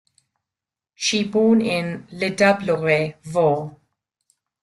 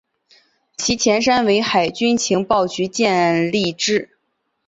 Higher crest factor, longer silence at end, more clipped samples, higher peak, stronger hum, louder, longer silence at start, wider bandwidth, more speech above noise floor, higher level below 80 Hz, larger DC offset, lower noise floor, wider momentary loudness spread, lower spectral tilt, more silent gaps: about the same, 18 dB vs 16 dB; first, 0.95 s vs 0.6 s; neither; about the same, -4 dBFS vs -2 dBFS; neither; second, -20 LUFS vs -17 LUFS; first, 1 s vs 0.8 s; first, 12 kHz vs 8 kHz; first, 69 dB vs 54 dB; second, -62 dBFS vs -52 dBFS; neither; first, -88 dBFS vs -71 dBFS; first, 9 LU vs 6 LU; first, -5 dB/octave vs -3.5 dB/octave; neither